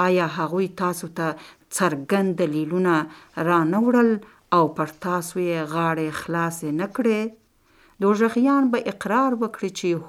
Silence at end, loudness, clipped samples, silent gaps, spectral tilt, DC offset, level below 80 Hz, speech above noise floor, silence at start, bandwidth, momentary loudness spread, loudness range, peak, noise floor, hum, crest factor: 0 s; -23 LUFS; under 0.1%; none; -6 dB/octave; under 0.1%; -64 dBFS; 35 dB; 0 s; 16 kHz; 8 LU; 3 LU; -4 dBFS; -57 dBFS; none; 18 dB